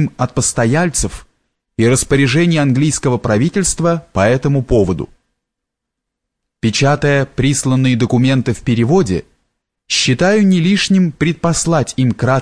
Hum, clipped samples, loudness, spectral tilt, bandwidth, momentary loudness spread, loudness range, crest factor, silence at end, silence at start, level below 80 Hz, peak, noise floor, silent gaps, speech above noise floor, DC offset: none; under 0.1%; -14 LUFS; -5 dB/octave; 11 kHz; 5 LU; 3 LU; 14 dB; 0 s; 0 s; -36 dBFS; -2 dBFS; -79 dBFS; none; 65 dB; 0.5%